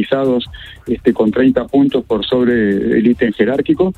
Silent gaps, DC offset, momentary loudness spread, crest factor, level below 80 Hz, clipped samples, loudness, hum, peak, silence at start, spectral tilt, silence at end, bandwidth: none; under 0.1%; 6 LU; 14 dB; -42 dBFS; under 0.1%; -14 LUFS; none; 0 dBFS; 0 s; -8 dB/octave; 0.05 s; 4.6 kHz